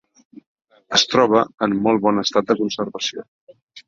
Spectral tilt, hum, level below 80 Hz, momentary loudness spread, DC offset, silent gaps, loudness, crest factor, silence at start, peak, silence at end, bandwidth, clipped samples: -3.5 dB/octave; none; -60 dBFS; 10 LU; under 0.1%; 0.47-0.56 s, 1.54-1.58 s, 3.28-3.47 s, 3.62-3.68 s; -18 LUFS; 20 dB; 0.35 s; 0 dBFS; 0.1 s; 7.8 kHz; under 0.1%